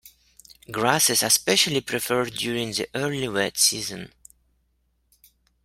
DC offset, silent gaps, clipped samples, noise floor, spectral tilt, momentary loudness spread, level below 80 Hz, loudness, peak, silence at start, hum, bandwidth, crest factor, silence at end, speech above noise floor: under 0.1%; none; under 0.1%; -69 dBFS; -2 dB/octave; 13 LU; -60 dBFS; -22 LUFS; -2 dBFS; 0.05 s; none; 16.5 kHz; 24 dB; 1.55 s; 46 dB